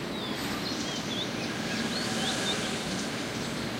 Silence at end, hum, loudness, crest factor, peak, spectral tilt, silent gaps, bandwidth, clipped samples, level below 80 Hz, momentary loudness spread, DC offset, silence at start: 0 s; none; -31 LUFS; 14 dB; -18 dBFS; -3.5 dB/octave; none; 16 kHz; under 0.1%; -56 dBFS; 4 LU; under 0.1%; 0 s